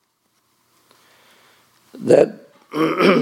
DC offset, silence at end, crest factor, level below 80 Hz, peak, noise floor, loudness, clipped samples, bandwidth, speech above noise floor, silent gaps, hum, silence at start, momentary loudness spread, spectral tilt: under 0.1%; 0 s; 20 dB; -66 dBFS; 0 dBFS; -66 dBFS; -17 LUFS; under 0.1%; 14 kHz; 51 dB; none; none; 1.95 s; 15 LU; -6 dB/octave